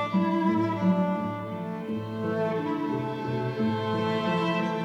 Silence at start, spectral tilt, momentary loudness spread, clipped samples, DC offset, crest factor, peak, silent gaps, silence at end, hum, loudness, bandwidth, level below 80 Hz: 0 s; -8 dB/octave; 8 LU; under 0.1%; under 0.1%; 14 dB; -12 dBFS; none; 0 s; none; -28 LUFS; 8.2 kHz; -68 dBFS